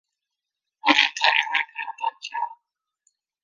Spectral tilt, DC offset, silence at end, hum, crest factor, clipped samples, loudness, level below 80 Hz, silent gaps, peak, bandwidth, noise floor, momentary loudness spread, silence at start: 0.5 dB/octave; under 0.1%; 0.9 s; none; 24 dB; under 0.1%; -22 LUFS; -82 dBFS; none; -2 dBFS; 10 kHz; -85 dBFS; 13 LU; 0.85 s